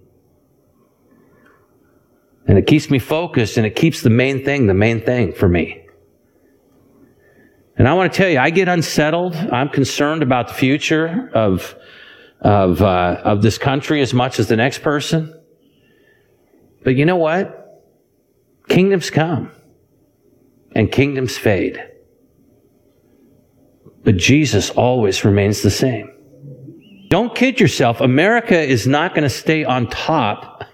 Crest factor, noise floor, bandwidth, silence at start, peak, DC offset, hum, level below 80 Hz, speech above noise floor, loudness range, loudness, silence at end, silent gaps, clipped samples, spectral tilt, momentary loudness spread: 16 dB; -59 dBFS; 16.5 kHz; 2.45 s; 0 dBFS; under 0.1%; none; -44 dBFS; 44 dB; 6 LU; -16 LUFS; 0.1 s; none; under 0.1%; -6 dB/octave; 7 LU